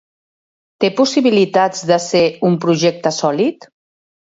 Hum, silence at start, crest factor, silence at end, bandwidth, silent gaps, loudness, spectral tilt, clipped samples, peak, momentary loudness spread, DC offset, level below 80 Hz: none; 0.8 s; 16 dB; 0.7 s; 8 kHz; none; -15 LUFS; -5 dB/octave; under 0.1%; 0 dBFS; 5 LU; under 0.1%; -64 dBFS